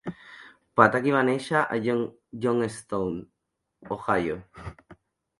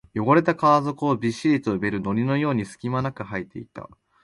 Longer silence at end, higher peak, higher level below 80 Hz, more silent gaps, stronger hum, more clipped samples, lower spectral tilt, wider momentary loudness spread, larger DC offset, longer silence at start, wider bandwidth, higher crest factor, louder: about the same, 0.45 s vs 0.35 s; first, 0 dBFS vs -6 dBFS; about the same, -58 dBFS vs -56 dBFS; neither; neither; neither; about the same, -6.5 dB/octave vs -7.5 dB/octave; first, 22 LU vs 15 LU; neither; about the same, 0.05 s vs 0.15 s; about the same, 11.5 kHz vs 11.5 kHz; first, 26 dB vs 18 dB; about the same, -25 LUFS vs -23 LUFS